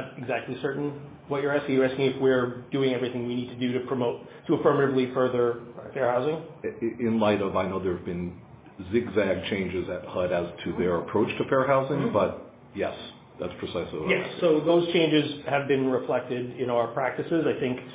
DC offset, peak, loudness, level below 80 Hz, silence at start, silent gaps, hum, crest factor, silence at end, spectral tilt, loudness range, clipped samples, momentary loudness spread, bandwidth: under 0.1%; -8 dBFS; -27 LUFS; -56 dBFS; 0 s; none; none; 18 dB; 0 s; -10.5 dB/octave; 3 LU; under 0.1%; 10 LU; 4 kHz